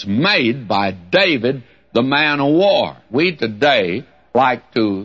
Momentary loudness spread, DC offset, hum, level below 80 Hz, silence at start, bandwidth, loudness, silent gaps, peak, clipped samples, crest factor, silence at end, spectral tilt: 8 LU; 0.2%; none; -58 dBFS; 0 s; 7.6 kHz; -16 LUFS; none; -2 dBFS; under 0.1%; 14 dB; 0 s; -6.5 dB/octave